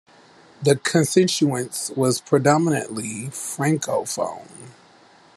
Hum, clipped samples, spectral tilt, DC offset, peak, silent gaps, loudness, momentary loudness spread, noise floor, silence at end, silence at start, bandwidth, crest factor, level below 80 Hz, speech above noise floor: none; under 0.1%; -4.5 dB/octave; under 0.1%; -2 dBFS; none; -21 LUFS; 11 LU; -52 dBFS; 0.65 s; 0.6 s; 13 kHz; 20 dB; -66 dBFS; 31 dB